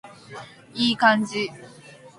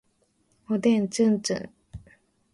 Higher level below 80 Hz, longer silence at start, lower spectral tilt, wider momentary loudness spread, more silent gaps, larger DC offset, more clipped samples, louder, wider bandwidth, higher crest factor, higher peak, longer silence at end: second, -66 dBFS vs -58 dBFS; second, 0.05 s vs 0.7 s; second, -4 dB/octave vs -5.5 dB/octave; about the same, 22 LU vs 24 LU; neither; neither; neither; first, -22 LUFS vs -25 LUFS; about the same, 11.5 kHz vs 11.5 kHz; first, 22 dB vs 16 dB; first, -2 dBFS vs -10 dBFS; second, 0.1 s vs 0.55 s